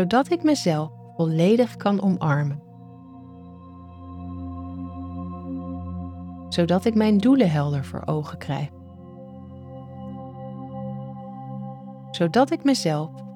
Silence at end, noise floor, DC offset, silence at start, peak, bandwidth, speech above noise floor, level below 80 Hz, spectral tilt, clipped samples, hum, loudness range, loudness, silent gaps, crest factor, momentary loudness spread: 0 s; -44 dBFS; under 0.1%; 0 s; -6 dBFS; 15 kHz; 23 dB; -54 dBFS; -6.5 dB/octave; under 0.1%; none; 13 LU; -23 LUFS; none; 18 dB; 23 LU